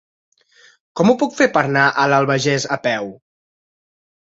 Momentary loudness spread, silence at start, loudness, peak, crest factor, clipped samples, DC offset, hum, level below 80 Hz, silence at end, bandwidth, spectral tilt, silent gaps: 9 LU; 0.95 s; -16 LUFS; 0 dBFS; 18 dB; under 0.1%; under 0.1%; none; -60 dBFS; 1.15 s; 8 kHz; -5 dB/octave; none